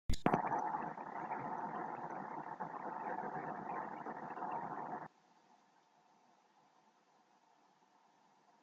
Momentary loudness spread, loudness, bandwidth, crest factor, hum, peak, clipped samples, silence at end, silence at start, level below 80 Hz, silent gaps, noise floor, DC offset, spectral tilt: 10 LU; -43 LUFS; 7.6 kHz; 30 dB; none; -14 dBFS; under 0.1%; 3.1 s; 0.1 s; -56 dBFS; none; -72 dBFS; under 0.1%; -5 dB/octave